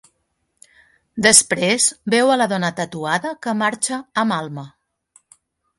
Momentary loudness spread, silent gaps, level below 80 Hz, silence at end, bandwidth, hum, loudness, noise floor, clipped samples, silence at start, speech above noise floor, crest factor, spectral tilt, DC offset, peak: 14 LU; none; -62 dBFS; 1.1 s; 16 kHz; none; -17 LUFS; -70 dBFS; under 0.1%; 1.15 s; 52 dB; 20 dB; -2.5 dB/octave; under 0.1%; 0 dBFS